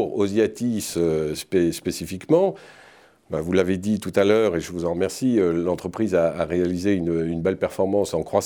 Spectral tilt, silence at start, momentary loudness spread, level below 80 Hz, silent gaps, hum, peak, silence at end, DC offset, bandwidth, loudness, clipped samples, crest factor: -6 dB/octave; 0 s; 6 LU; -52 dBFS; none; none; -4 dBFS; 0 s; under 0.1%; over 20 kHz; -23 LUFS; under 0.1%; 18 dB